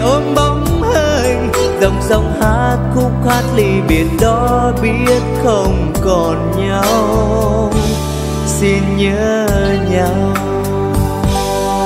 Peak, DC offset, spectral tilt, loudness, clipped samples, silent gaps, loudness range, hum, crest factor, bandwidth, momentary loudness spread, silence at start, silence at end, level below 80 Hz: 0 dBFS; under 0.1%; -6 dB/octave; -13 LUFS; under 0.1%; none; 1 LU; none; 12 dB; 16 kHz; 3 LU; 0 s; 0 s; -22 dBFS